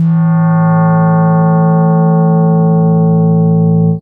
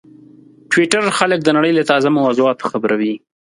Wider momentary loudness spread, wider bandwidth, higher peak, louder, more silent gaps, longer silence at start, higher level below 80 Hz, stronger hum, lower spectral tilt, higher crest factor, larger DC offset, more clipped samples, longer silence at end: second, 1 LU vs 6 LU; second, 2.2 kHz vs 11.5 kHz; about the same, -2 dBFS vs 0 dBFS; first, -10 LUFS vs -15 LUFS; neither; second, 0 s vs 0.7 s; first, -50 dBFS vs -64 dBFS; neither; first, -14.5 dB/octave vs -4.5 dB/octave; second, 6 dB vs 16 dB; neither; neither; second, 0 s vs 0.35 s